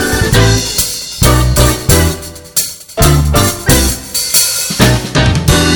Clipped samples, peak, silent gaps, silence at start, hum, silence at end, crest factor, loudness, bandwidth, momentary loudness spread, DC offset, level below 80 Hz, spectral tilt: 0.3%; 0 dBFS; none; 0 s; none; 0 s; 10 dB; -11 LUFS; over 20 kHz; 6 LU; 0.3%; -18 dBFS; -3.5 dB/octave